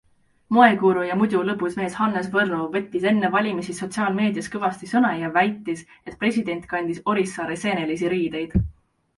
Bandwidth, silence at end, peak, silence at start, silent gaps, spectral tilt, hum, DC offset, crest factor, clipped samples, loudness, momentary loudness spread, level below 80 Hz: 11.5 kHz; 0.45 s; 0 dBFS; 0.5 s; none; -6 dB/octave; none; under 0.1%; 22 dB; under 0.1%; -22 LUFS; 7 LU; -44 dBFS